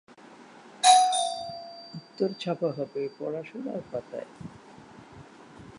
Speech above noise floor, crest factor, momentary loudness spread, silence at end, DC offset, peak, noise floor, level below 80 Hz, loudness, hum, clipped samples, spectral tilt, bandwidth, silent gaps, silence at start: 18 dB; 24 dB; 24 LU; 0 s; under 0.1%; -6 dBFS; -50 dBFS; -68 dBFS; -26 LUFS; none; under 0.1%; -2.5 dB/octave; 11.5 kHz; none; 0.25 s